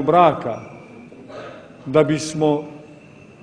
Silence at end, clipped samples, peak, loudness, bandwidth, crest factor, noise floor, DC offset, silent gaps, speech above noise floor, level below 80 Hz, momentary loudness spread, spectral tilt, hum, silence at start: 0.55 s; under 0.1%; 0 dBFS; -19 LUFS; 10.5 kHz; 20 dB; -44 dBFS; under 0.1%; none; 26 dB; -58 dBFS; 25 LU; -6 dB/octave; none; 0 s